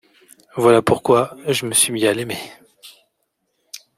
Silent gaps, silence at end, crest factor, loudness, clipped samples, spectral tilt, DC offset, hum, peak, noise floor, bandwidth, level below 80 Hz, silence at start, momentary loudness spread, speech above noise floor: none; 0.2 s; 18 dB; -17 LUFS; under 0.1%; -3.5 dB/octave; under 0.1%; none; -2 dBFS; -72 dBFS; 16 kHz; -58 dBFS; 0.55 s; 21 LU; 54 dB